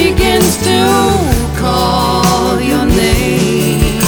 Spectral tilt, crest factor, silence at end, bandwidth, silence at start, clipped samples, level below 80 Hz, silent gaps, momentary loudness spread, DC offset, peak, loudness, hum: -4.5 dB/octave; 10 dB; 0 s; over 20 kHz; 0 s; under 0.1%; -20 dBFS; none; 3 LU; under 0.1%; 0 dBFS; -11 LUFS; none